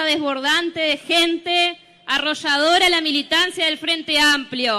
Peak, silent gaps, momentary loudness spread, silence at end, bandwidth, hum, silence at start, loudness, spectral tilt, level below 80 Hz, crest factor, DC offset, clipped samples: -6 dBFS; none; 6 LU; 0 s; 15.5 kHz; none; 0 s; -17 LUFS; -1 dB/octave; -54 dBFS; 14 dB; under 0.1%; under 0.1%